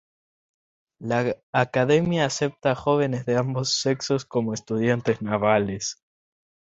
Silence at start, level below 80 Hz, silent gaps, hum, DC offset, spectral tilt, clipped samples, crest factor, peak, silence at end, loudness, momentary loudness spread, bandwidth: 1 s; -58 dBFS; 1.43-1.53 s; none; under 0.1%; -5 dB/octave; under 0.1%; 20 dB; -6 dBFS; 0.7 s; -24 LUFS; 7 LU; 8 kHz